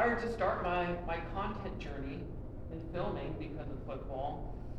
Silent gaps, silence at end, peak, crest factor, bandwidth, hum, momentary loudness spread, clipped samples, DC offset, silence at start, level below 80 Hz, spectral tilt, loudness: none; 0 s; -18 dBFS; 18 dB; 9.8 kHz; none; 11 LU; under 0.1%; under 0.1%; 0 s; -46 dBFS; -7.5 dB/octave; -39 LUFS